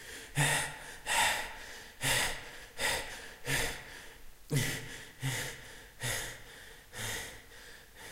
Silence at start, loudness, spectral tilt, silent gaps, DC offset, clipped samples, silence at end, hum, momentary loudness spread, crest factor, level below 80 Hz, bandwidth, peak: 0 s; -34 LUFS; -2.5 dB/octave; none; under 0.1%; under 0.1%; 0 s; none; 20 LU; 22 dB; -52 dBFS; 16 kHz; -16 dBFS